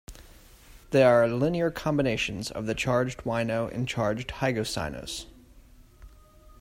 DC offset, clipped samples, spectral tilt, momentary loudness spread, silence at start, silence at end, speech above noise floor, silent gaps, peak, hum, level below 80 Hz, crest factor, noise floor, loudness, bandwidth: under 0.1%; under 0.1%; -5.5 dB/octave; 12 LU; 0.1 s; 0.05 s; 27 dB; none; -8 dBFS; none; -50 dBFS; 20 dB; -53 dBFS; -27 LUFS; 16 kHz